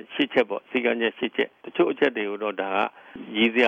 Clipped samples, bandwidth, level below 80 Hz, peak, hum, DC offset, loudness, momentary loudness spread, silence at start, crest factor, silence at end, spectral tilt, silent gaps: under 0.1%; 7.4 kHz; -70 dBFS; -6 dBFS; none; under 0.1%; -25 LUFS; 6 LU; 0.1 s; 18 dB; 0 s; -6 dB/octave; none